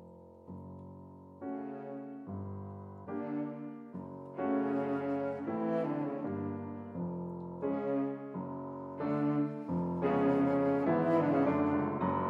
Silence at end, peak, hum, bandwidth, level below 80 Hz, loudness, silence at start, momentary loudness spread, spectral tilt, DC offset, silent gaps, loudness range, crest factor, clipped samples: 0 s; -18 dBFS; none; 5.2 kHz; -72 dBFS; -34 LUFS; 0 s; 17 LU; -10 dB/octave; under 0.1%; none; 12 LU; 16 dB; under 0.1%